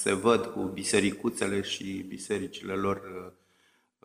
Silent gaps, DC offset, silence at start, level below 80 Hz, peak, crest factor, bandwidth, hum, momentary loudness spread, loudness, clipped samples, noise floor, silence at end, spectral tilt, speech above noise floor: none; under 0.1%; 0 s; -64 dBFS; -8 dBFS; 22 dB; 15.5 kHz; none; 12 LU; -30 LUFS; under 0.1%; -68 dBFS; 0.75 s; -4 dB/octave; 39 dB